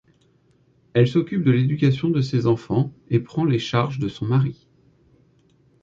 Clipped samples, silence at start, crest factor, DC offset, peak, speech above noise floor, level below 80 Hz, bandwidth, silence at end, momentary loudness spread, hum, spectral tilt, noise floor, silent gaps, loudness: under 0.1%; 0.95 s; 18 dB; under 0.1%; -4 dBFS; 40 dB; -54 dBFS; 7.4 kHz; 1.3 s; 6 LU; none; -8 dB/octave; -60 dBFS; none; -21 LUFS